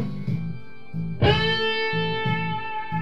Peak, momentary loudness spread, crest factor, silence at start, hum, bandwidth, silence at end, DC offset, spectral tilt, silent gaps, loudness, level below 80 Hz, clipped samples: -6 dBFS; 13 LU; 20 dB; 0 s; none; 7.4 kHz; 0 s; 2%; -7 dB/octave; none; -24 LUFS; -42 dBFS; under 0.1%